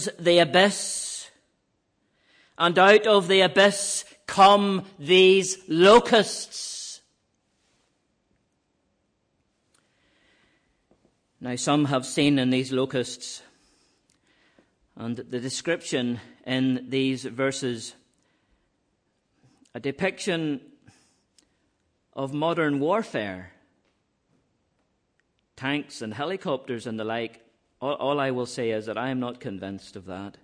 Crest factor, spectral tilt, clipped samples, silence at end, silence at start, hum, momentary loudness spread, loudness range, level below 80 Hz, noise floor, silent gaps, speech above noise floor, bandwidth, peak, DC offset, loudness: 20 dB; -4 dB/octave; under 0.1%; 0.15 s; 0 s; none; 19 LU; 14 LU; -66 dBFS; -73 dBFS; none; 50 dB; 10.5 kHz; -6 dBFS; under 0.1%; -23 LUFS